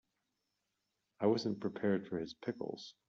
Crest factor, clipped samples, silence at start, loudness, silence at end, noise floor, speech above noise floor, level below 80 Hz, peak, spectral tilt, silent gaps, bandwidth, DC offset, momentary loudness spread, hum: 20 dB; under 0.1%; 1.2 s; -38 LUFS; 0.15 s; -86 dBFS; 49 dB; -78 dBFS; -18 dBFS; -5.5 dB/octave; none; 7.6 kHz; under 0.1%; 9 LU; none